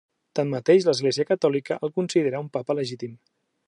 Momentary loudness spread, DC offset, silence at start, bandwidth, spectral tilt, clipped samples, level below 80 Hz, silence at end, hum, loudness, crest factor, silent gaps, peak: 12 LU; under 0.1%; 0.35 s; 11.5 kHz; -5.5 dB/octave; under 0.1%; -74 dBFS; 0.5 s; none; -24 LUFS; 18 dB; none; -6 dBFS